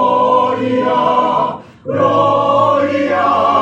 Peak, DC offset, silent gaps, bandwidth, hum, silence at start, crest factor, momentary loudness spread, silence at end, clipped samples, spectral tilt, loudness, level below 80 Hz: -2 dBFS; under 0.1%; none; 8.4 kHz; none; 0 s; 12 dB; 5 LU; 0 s; under 0.1%; -6.5 dB/octave; -13 LUFS; -58 dBFS